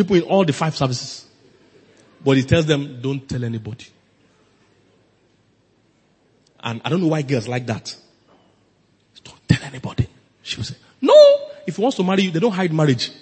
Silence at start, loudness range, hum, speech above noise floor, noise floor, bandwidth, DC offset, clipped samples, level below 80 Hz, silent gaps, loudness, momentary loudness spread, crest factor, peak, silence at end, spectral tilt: 0 s; 14 LU; none; 42 dB; -60 dBFS; 8.8 kHz; under 0.1%; under 0.1%; -50 dBFS; none; -19 LUFS; 18 LU; 20 dB; 0 dBFS; 0.1 s; -6 dB/octave